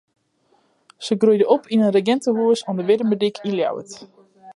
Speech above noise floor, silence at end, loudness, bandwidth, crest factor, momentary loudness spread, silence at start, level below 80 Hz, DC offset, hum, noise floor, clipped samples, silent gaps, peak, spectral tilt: 44 dB; 0.05 s; -19 LUFS; 11 kHz; 18 dB; 14 LU; 1 s; -74 dBFS; under 0.1%; none; -63 dBFS; under 0.1%; none; -2 dBFS; -6 dB/octave